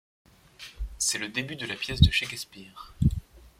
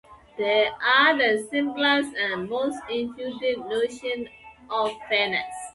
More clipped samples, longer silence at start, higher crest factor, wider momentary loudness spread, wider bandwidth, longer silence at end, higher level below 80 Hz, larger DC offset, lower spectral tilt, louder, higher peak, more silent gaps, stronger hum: neither; first, 0.6 s vs 0.1 s; about the same, 24 dB vs 20 dB; first, 23 LU vs 12 LU; first, 16 kHz vs 11.5 kHz; about the same, 0.1 s vs 0.05 s; first, -38 dBFS vs -64 dBFS; neither; about the same, -3.5 dB/octave vs -3 dB/octave; second, -27 LUFS vs -24 LUFS; about the same, -4 dBFS vs -4 dBFS; neither; neither